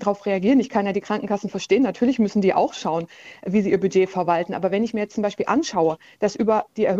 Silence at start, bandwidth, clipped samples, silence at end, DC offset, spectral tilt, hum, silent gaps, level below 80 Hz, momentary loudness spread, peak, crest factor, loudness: 0 s; 8 kHz; under 0.1%; 0 s; under 0.1%; -6 dB/octave; none; none; -60 dBFS; 7 LU; -4 dBFS; 16 dB; -22 LUFS